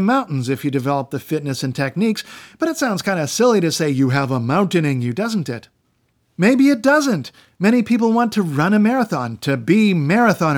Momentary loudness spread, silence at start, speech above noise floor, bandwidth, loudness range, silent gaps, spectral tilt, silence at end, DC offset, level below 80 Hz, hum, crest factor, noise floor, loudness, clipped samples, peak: 9 LU; 0 s; 47 dB; 19.5 kHz; 3 LU; none; -6 dB/octave; 0 s; under 0.1%; -66 dBFS; none; 14 dB; -64 dBFS; -18 LUFS; under 0.1%; -2 dBFS